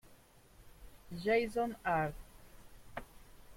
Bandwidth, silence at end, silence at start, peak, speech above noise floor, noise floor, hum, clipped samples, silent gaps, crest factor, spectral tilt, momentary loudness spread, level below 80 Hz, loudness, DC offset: 16.5 kHz; 0 s; 0.1 s; -22 dBFS; 28 dB; -62 dBFS; none; under 0.1%; none; 18 dB; -6 dB/octave; 18 LU; -58 dBFS; -35 LUFS; under 0.1%